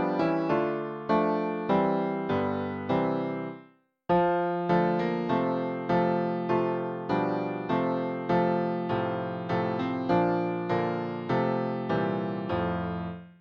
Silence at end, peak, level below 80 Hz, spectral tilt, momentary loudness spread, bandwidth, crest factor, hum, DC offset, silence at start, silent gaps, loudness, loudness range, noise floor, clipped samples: 0.1 s; -12 dBFS; -60 dBFS; -9 dB/octave; 7 LU; 6.6 kHz; 16 dB; none; under 0.1%; 0 s; none; -28 LUFS; 1 LU; -57 dBFS; under 0.1%